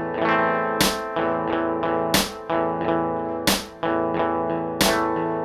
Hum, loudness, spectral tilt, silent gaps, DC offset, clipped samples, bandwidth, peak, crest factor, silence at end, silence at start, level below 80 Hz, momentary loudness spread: none; -22 LUFS; -3.5 dB/octave; none; under 0.1%; under 0.1%; 17.5 kHz; -4 dBFS; 18 dB; 0 s; 0 s; -48 dBFS; 5 LU